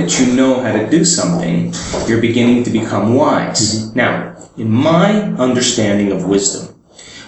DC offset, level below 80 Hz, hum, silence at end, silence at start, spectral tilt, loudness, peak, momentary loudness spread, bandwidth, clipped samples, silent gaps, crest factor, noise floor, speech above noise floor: under 0.1%; -44 dBFS; none; 0 s; 0 s; -4.5 dB/octave; -14 LUFS; 0 dBFS; 7 LU; 8.6 kHz; under 0.1%; none; 14 dB; -38 dBFS; 24 dB